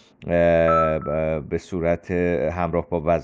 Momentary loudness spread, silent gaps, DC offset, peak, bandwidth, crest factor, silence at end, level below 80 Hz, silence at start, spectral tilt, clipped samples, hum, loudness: 7 LU; none; under 0.1%; -8 dBFS; 7.8 kHz; 14 dB; 0 s; -40 dBFS; 0.2 s; -8 dB/octave; under 0.1%; none; -22 LUFS